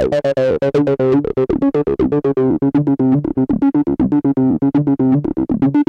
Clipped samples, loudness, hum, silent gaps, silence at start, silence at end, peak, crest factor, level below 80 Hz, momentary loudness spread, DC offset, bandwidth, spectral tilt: under 0.1%; -15 LUFS; none; none; 0 s; 0.05 s; -4 dBFS; 10 dB; -40 dBFS; 2 LU; under 0.1%; 6.2 kHz; -9.5 dB/octave